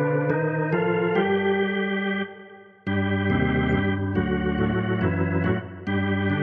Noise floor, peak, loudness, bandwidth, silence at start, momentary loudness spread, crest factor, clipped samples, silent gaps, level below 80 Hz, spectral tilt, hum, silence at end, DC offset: -46 dBFS; -8 dBFS; -24 LUFS; 4.6 kHz; 0 s; 6 LU; 14 dB; under 0.1%; none; -44 dBFS; -10 dB/octave; none; 0 s; under 0.1%